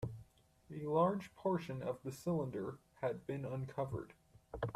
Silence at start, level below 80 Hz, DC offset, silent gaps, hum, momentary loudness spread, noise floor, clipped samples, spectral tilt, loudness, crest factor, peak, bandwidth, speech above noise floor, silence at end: 0 s; -66 dBFS; under 0.1%; none; none; 14 LU; -65 dBFS; under 0.1%; -8 dB/octave; -41 LUFS; 18 dB; -22 dBFS; 14 kHz; 26 dB; 0 s